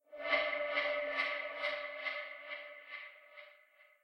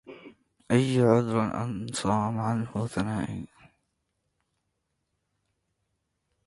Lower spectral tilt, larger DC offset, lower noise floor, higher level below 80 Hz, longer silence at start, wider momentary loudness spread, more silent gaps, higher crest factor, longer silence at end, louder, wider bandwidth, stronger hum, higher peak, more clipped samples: second, -2 dB/octave vs -6.5 dB/octave; neither; second, -66 dBFS vs -79 dBFS; second, -78 dBFS vs -58 dBFS; about the same, 0.1 s vs 0.05 s; first, 17 LU vs 13 LU; neither; about the same, 22 dB vs 20 dB; second, 0.15 s vs 3 s; second, -37 LUFS vs -27 LUFS; first, 16 kHz vs 11.5 kHz; neither; second, -18 dBFS vs -10 dBFS; neither